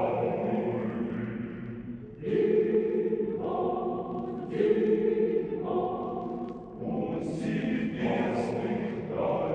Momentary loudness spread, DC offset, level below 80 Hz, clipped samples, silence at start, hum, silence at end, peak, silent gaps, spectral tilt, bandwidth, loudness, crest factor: 11 LU; under 0.1%; -58 dBFS; under 0.1%; 0 s; none; 0 s; -12 dBFS; none; -8.5 dB/octave; 9.2 kHz; -30 LUFS; 18 dB